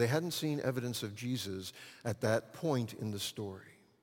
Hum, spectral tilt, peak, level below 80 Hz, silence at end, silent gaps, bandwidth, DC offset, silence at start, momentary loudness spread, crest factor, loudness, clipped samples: none; -5 dB/octave; -16 dBFS; -74 dBFS; 0.3 s; none; 17 kHz; under 0.1%; 0 s; 10 LU; 20 dB; -37 LUFS; under 0.1%